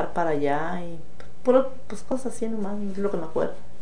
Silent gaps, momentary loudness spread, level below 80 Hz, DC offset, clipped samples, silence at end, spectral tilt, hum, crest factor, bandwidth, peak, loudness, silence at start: none; 13 LU; -54 dBFS; 6%; under 0.1%; 0 s; -6.5 dB/octave; none; 20 dB; 10 kHz; -6 dBFS; -27 LUFS; 0 s